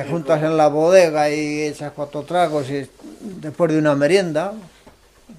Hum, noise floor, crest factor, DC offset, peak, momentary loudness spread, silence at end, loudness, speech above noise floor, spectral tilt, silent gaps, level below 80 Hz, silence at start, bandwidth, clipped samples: none; -49 dBFS; 18 dB; under 0.1%; -2 dBFS; 19 LU; 0.05 s; -18 LUFS; 31 dB; -5.5 dB/octave; none; -58 dBFS; 0 s; 13.5 kHz; under 0.1%